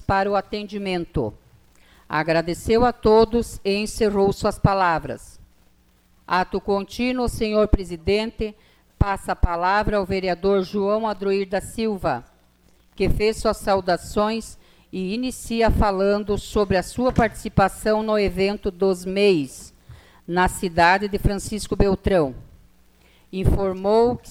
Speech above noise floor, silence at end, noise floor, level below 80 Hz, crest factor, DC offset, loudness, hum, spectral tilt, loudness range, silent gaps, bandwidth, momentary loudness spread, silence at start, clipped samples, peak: 37 dB; 0 s; -58 dBFS; -34 dBFS; 18 dB; under 0.1%; -22 LUFS; none; -6 dB/octave; 3 LU; none; 16 kHz; 9 LU; 0 s; under 0.1%; -4 dBFS